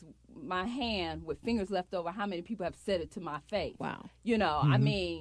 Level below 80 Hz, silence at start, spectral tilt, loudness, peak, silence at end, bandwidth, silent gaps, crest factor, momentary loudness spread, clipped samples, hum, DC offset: -54 dBFS; 0 s; -7 dB/octave; -33 LUFS; -16 dBFS; 0 s; 11 kHz; none; 18 dB; 12 LU; under 0.1%; none; under 0.1%